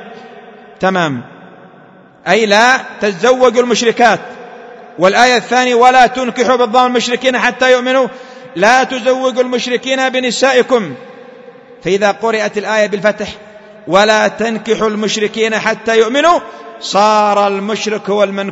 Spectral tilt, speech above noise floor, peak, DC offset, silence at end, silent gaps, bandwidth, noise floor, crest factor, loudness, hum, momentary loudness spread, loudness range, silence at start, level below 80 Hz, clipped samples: -3.5 dB/octave; 29 dB; 0 dBFS; under 0.1%; 0 s; none; 11 kHz; -41 dBFS; 12 dB; -12 LUFS; none; 14 LU; 4 LU; 0 s; -52 dBFS; 0.2%